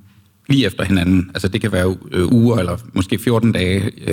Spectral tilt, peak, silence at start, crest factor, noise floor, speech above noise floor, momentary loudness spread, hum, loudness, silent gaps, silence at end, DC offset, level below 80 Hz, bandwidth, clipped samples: -6.5 dB/octave; -4 dBFS; 0.5 s; 12 dB; -41 dBFS; 25 dB; 6 LU; none; -17 LUFS; none; 0 s; under 0.1%; -40 dBFS; 17 kHz; under 0.1%